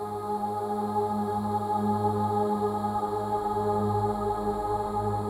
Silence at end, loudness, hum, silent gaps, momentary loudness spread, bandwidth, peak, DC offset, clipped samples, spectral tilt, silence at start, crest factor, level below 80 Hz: 0 s; -28 LUFS; none; none; 3 LU; 16 kHz; -14 dBFS; under 0.1%; under 0.1%; -8 dB/octave; 0 s; 14 dB; -50 dBFS